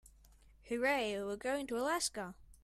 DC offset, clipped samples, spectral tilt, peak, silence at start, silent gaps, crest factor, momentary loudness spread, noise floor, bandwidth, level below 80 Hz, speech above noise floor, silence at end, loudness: under 0.1%; under 0.1%; -2.5 dB/octave; -22 dBFS; 0.65 s; none; 16 dB; 10 LU; -63 dBFS; 15.5 kHz; -64 dBFS; 26 dB; 0.1 s; -37 LUFS